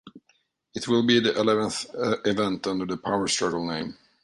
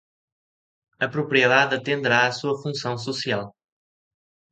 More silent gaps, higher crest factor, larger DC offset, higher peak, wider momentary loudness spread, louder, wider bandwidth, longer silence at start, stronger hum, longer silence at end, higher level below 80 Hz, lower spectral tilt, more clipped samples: neither; about the same, 18 dB vs 22 dB; neither; second, -8 dBFS vs -4 dBFS; about the same, 11 LU vs 11 LU; second, -25 LUFS vs -22 LUFS; first, 11.5 kHz vs 9.2 kHz; second, 0.05 s vs 1 s; neither; second, 0.3 s vs 1 s; first, -60 dBFS vs -68 dBFS; about the same, -4 dB/octave vs -4.5 dB/octave; neither